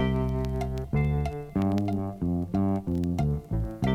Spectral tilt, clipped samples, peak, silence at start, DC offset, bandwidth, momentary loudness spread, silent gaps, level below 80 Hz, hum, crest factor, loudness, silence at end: -8.5 dB/octave; under 0.1%; -14 dBFS; 0 s; under 0.1%; 14.5 kHz; 4 LU; none; -36 dBFS; none; 14 dB; -29 LUFS; 0 s